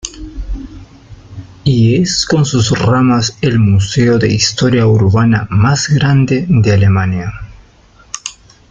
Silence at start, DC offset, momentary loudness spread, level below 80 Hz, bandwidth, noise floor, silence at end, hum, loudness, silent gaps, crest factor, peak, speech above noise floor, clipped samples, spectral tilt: 0.05 s; under 0.1%; 16 LU; -34 dBFS; 9 kHz; -44 dBFS; 0.4 s; none; -11 LUFS; none; 12 dB; 0 dBFS; 34 dB; under 0.1%; -5.5 dB/octave